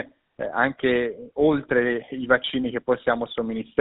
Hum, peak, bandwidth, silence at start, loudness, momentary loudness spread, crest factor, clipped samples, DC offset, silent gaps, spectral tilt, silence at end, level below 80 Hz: none; -6 dBFS; 4.1 kHz; 0 s; -24 LUFS; 8 LU; 18 dB; under 0.1%; under 0.1%; none; -3 dB/octave; 0 s; -54 dBFS